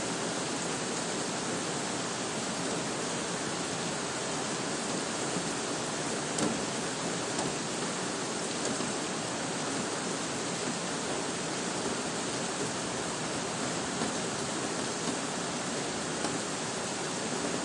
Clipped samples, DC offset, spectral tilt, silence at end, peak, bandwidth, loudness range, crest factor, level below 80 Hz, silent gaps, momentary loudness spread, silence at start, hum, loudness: under 0.1%; under 0.1%; -2.5 dB/octave; 0 s; -14 dBFS; 11.5 kHz; 1 LU; 20 dB; -66 dBFS; none; 1 LU; 0 s; none; -32 LUFS